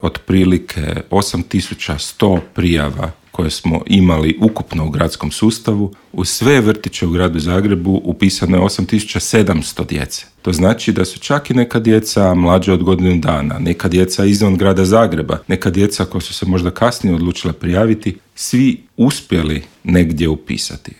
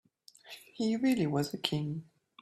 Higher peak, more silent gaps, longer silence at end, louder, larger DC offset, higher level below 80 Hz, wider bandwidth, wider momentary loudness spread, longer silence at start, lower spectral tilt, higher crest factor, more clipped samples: first, 0 dBFS vs -12 dBFS; neither; second, 0.1 s vs 0.4 s; first, -15 LUFS vs -32 LUFS; neither; first, -36 dBFS vs -70 dBFS; first, 17 kHz vs 15 kHz; second, 9 LU vs 20 LU; second, 0 s vs 0.45 s; about the same, -5.5 dB/octave vs -6 dB/octave; second, 14 dB vs 22 dB; neither